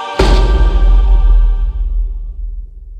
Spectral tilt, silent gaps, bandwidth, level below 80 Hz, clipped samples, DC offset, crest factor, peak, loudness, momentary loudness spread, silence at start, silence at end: -6.5 dB/octave; none; 8.2 kHz; -10 dBFS; under 0.1%; under 0.1%; 10 dB; 0 dBFS; -14 LUFS; 15 LU; 0 s; 0 s